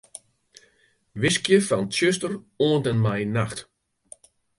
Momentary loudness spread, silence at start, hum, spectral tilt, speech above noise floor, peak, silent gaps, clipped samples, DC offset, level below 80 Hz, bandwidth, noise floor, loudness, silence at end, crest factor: 18 LU; 1.15 s; none; -5 dB/octave; 41 dB; -6 dBFS; none; under 0.1%; under 0.1%; -58 dBFS; 11.5 kHz; -64 dBFS; -23 LUFS; 0.95 s; 20 dB